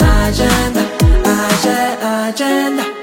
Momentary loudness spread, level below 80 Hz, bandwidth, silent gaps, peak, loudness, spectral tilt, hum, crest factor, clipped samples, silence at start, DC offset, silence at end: 4 LU; -18 dBFS; 16.5 kHz; none; 0 dBFS; -14 LUFS; -5 dB/octave; none; 12 dB; under 0.1%; 0 s; under 0.1%; 0 s